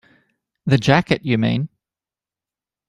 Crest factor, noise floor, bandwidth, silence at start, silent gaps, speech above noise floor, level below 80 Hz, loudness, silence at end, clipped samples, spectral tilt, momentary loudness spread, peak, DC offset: 20 dB; under -90 dBFS; 10.5 kHz; 0.65 s; none; over 73 dB; -52 dBFS; -18 LUFS; 1.2 s; under 0.1%; -6.5 dB/octave; 13 LU; -2 dBFS; under 0.1%